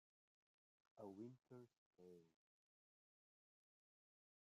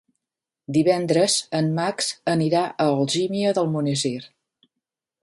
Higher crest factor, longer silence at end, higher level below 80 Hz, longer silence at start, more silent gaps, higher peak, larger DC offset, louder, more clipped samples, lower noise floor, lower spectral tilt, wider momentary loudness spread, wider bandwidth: about the same, 20 dB vs 18 dB; first, 2.1 s vs 0.95 s; second, under -90 dBFS vs -66 dBFS; first, 0.95 s vs 0.7 s; first, 1.78-1.91 s vs none; second, -46 dBFS vs -6 dBFS; neither; second, -62 LUFS vs -22 LUFS; neither; about the same, under -90 dBFS vs -88 dBFS; first, -8.5 dB/octave vs -4.5 dB/octave; first, 9 LU vs 6 LU; second, 7.4 kHz vs 11.5 kHz